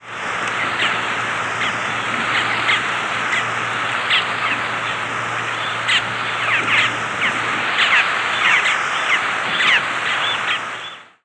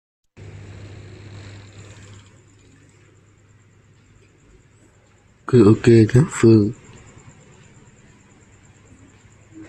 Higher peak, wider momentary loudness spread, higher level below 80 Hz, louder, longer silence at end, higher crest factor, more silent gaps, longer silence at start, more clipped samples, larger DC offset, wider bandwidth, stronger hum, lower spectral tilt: about the same, -2 dBFS vs -2 dBFS; second, 7 LU vs 29 LU; second, -60 dBFS vs -50 dBFS; about the same, -17 LUFS vs -15 LUFS; second, 0.2 s vs 2.95 s; about the same, 18 dB vs 18 dB; neither; second, 0 s vs 5.5 s; neither; neither; first, 11 kHz vs 9.8 kHz; neither; second, -2 dB/octave vs -7.5 dB/octave